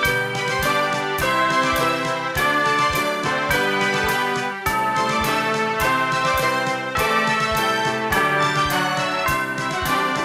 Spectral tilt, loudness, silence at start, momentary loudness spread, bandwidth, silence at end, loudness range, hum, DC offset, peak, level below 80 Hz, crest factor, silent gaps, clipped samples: -3.5 dB/octave; -20 LUFS; 0 s; 4 LU; 16 kHz; 0 s; 1 LU; none; under 0.1%; -4 dBFS; -42 dBFS; 16 dB; none; under 0.1%